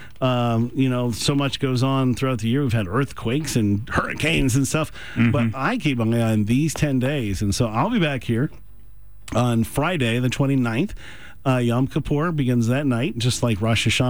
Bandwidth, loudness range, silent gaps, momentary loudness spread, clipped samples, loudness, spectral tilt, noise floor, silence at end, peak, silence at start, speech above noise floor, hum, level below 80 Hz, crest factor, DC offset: over 20 kHz; 2 LU; none; 4 LU; under 0.1%; -22 LUFS; -5.5 dB/octave; -46 dBFS; 0 s; -8 dBFS; 0 s; 26 dB; none; -42 dBFS; 12 dB; 1%